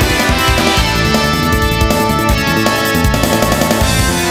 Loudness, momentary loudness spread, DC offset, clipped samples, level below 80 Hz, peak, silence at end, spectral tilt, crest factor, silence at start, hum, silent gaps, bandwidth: -12 LUFS; 1 LU; under 0.1%; under 0.1%; -20 dBFS; 0 dBFS; 0 s; -4 dB/octave; 12 dB; 0 s; none; none; 16.5 kHz